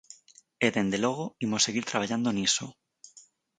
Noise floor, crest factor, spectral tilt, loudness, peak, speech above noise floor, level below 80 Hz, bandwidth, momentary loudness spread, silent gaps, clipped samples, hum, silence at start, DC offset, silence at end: -58 dBFS; 22 dB; -3 dB/octave; -28 LUFS; -10 dBFS; 30 dB; -66 dBFS; 9.6 kHz; 5 LU; none; under 0.1%; none; 0.1 s; under 0.1%; 0.35 s